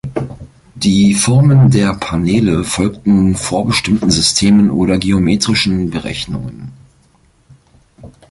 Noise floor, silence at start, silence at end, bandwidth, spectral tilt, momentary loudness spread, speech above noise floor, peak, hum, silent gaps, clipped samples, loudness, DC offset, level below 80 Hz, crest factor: -52 dBFS; 0.05 s; 0.25 s; 11.5 kHz; -5 dB/octave; 13 LU; 40 dB; 0 dBFS; none; none; under 0.1%; -13 LUFS; under 0.1%; -34 dBFS; 14 dB